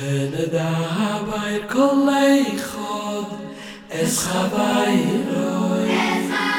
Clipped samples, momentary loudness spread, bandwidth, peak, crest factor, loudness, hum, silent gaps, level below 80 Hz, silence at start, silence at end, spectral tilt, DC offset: under 0.1%; 11 LU; 18 kHz; -6 dBFS; 16 dB; -20 LUFS; none; none; -54 dBFS; 0 s; 0 s; -5 dB/octave; under 0.1%